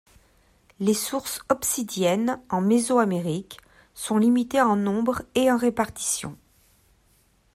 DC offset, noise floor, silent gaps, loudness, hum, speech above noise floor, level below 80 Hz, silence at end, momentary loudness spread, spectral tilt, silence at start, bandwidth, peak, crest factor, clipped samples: under 0.1%; -62 dBFS; none; -24 LUFS; none; 39 dB; -58 dBFS; 1.2 s; 9 LU; -4.5 dB/octave; 0.8 s; 16 kHz; -6 dBFS; 18 dB; under 0.1%